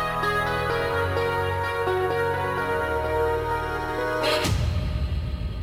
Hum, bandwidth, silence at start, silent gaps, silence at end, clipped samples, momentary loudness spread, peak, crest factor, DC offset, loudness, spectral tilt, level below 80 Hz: none; 16 kHz; 0 s; none; 0 s; under 0.1%; 5 LU; -12 dBFS; 14 dB; under 0.1%; -25 LUFS; -5.5 dB/octave; -34 dBFS